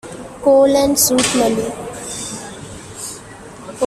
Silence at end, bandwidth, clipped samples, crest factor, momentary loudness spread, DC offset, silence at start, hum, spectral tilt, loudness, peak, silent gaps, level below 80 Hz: 0 s; 14.5 kHz; under 0.1%; 16 dB; 21 LU; under 0.1%; 0.05 s; none; -3 dB/octave; -15 LUFS; -2 dBFS; none; -46 dBFS